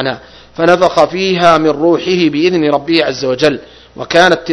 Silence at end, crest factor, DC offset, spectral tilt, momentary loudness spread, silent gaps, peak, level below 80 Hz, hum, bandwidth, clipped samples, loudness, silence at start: 0 s; 12 dB; under 0.1%; -5 dB/octave; 10 LU; none; 0 dBFS; -46 dBFS; none; 11 kHz; 0.8%; -11 LUFS; 0 s